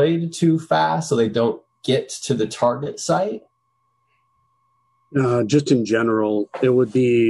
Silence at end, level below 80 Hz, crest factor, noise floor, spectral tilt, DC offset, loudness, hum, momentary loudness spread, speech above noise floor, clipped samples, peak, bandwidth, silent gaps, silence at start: 0 s; -60 dBFS; 14 dB; -68 dBFS; -6 dB/octave; under 0.1%; -20 LUFS; none; 7 LU; 50 dB; under 0.1%; -6 dBFS; 12 kHz; none; 0 s